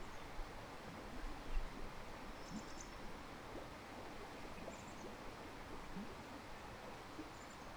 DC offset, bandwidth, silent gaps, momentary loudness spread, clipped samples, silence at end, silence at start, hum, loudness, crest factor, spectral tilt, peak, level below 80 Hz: under 0.1%; over 20 kHz; none; 3 LU; under 0.1%; 0 s; 0 s; none; -52 LUFS; 20 dB; -4.5 dB/octave; -28 dBFS; -54 dBFS